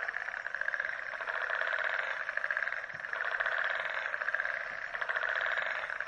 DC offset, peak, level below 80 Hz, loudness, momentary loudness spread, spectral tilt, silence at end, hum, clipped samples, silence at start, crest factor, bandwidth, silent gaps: under 0.1%; -16 dBFS; -72 dBFS; -34 LUFS; 5 LU; -1 dB/octave; 0 s; none; under 0.1%; 0 s; 20 dB; 10.5 kHz; none